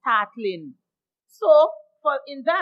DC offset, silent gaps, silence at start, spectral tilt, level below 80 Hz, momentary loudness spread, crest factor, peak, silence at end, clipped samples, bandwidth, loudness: under 0.1%; none; 0.05 s; -5 dB/octave; under -90 dBFS; 13 LU; 18 dB; -4 dBFS; 0 s; under 0.1%; 5.4 kHz; -21 LUFS